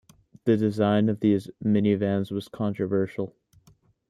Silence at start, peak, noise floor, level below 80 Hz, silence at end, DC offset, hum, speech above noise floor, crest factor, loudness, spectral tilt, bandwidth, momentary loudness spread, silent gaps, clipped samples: 0.45 s; -8 dBFS; -61 dBFS; -64 dBFS; 0.8 s; under 0.1%; none; 37 dB; 18 dB; -25 LUFS; -8.5 dB/octave; 11 kHz; 8 LU; none; under 0.1%